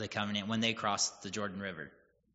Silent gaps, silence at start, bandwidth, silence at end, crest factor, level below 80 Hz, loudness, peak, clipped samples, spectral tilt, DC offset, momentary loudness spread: none; 0 s; 8 kHz; 0.45 s; 22 dB; -72 dBFS; -35 LUFS; -16 dBFS; under 0.1%; -2.5 dB/octave; under 0.1%; 12 LU